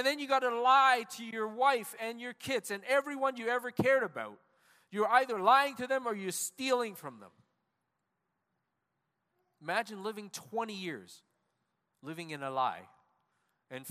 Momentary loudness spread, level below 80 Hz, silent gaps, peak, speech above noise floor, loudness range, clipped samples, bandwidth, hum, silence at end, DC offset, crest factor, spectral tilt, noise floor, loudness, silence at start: 19 LU; -80 dBFS; none; -12 dBFS; 52 dB; 11 LU; under 0.1%; 15.5 kHz; none; 0 s; under 0.1%; 22 dB; -3 dB/octave; -84 dBFS; -31 LUFS; 0 s